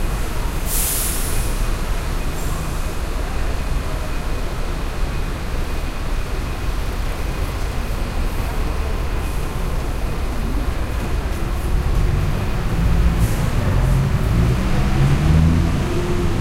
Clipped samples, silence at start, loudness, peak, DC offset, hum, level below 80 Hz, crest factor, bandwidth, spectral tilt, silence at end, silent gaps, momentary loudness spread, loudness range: under 0.1%; 0 s; -22 LUFS; -2 dBFS; under 0.1%; none; -20 dBFS; 16 dB; 16 kHz; -5.5 dB/octave; 0 s; none; 8 LU; 7 LU